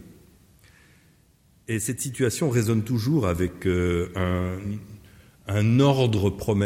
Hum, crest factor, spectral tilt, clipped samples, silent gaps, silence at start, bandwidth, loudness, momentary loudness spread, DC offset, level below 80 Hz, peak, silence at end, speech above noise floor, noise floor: none; 16 dB; -6 dB/octave; under 0.1%; none; 0 s; 16.5 kHz; -24 LUFS; 12 LU; under 0.1%; -48 dBFS; -8 dBFS; 0 s; 36 dB; -59 dBFS